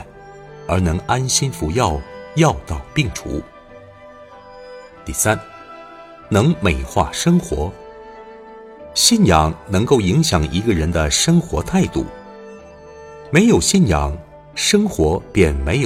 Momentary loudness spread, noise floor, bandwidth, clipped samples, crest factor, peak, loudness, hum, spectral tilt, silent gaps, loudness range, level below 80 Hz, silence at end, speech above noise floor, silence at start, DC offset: 24 LU; -41 dBFS; 16 kHz; under 0.1%; 18 dB; 0 dBFS; -17 LUFS; none; -4.5 dB/octave; none; 7 LU; -32 dBFS; 0 s; 25 dB; 0 s; under 0.1%